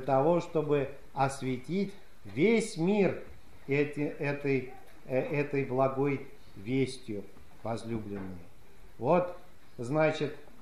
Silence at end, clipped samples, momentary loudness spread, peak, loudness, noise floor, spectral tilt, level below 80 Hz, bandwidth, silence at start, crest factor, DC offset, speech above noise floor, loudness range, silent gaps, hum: 0.2 s; under 0.1%; 15 LU; -14 dBFS; -31 LUFS; -56 dBFS; -6.5 dB/octave; -60 dBFS; 14 kHz; 0 s; 18 dB; 0.6%; 26 dB; 4 LU; none; none